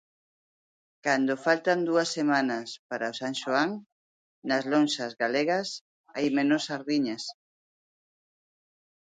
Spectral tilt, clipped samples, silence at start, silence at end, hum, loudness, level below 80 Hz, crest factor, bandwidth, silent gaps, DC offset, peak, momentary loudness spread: -4 dB/octave; under 0.1%; 1.05 s; 1.8 s; none; -27 LUFS; -78 dBFS; 20 dB; 9.4 kHz; 2.79-2.89 s, 3.92-4.42 s, 5.81-6.04 s; under 0.1%; -10 dBFS; 12 LU